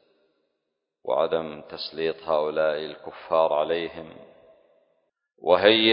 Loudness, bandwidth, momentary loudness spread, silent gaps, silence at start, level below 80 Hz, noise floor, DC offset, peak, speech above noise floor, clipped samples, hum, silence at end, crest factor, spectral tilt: -24 LUFS; 5.4 kHz; 18 LU; none; 1.05 s; -64 dBFS; -80 dBFS; under 0.1%; -2 dBFS; 57 dB; under 0.1%; none; 0 s; 24 dB; -8.5 dB/octave